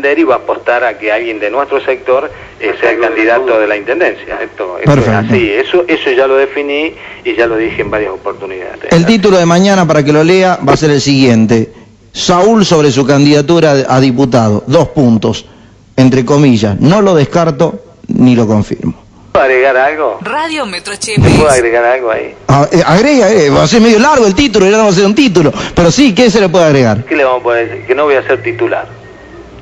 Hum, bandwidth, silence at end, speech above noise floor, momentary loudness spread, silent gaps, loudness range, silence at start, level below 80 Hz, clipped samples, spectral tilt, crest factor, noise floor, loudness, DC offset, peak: none; 12 kHz; 0 s; 23 dB; 10 LU; none; 5 LU; 0 s; -36 dBFS; 1%; -5.5 dB/octave; 8 dB; -31 dBFS; -9 LUFS; under 0.1%; 0 dBFS